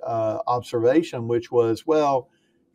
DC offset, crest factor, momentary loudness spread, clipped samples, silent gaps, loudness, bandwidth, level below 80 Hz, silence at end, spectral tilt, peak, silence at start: under 0.1%; 14 dB; 6 LU; under 0.1%; none; -23 LUFS; 12.5 kHz; -66 dBFS; 0.5 s; -7 dB/octave; -8 dBFS; 0 s